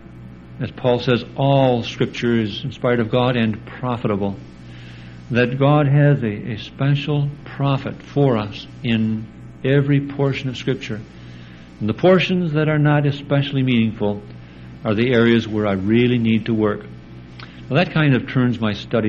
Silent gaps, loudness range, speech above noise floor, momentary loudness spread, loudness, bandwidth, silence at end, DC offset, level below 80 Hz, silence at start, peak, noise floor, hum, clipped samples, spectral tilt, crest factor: none; 3 LU; 21 dB; 22 LU; -19 LUFS; 7.2 kHz; 0 s; under 0.1%; -48 dBFS; 0 s; -2 dBFS; -39 dBFS; none; under 0.1%; -8 dB/octave; 18 dB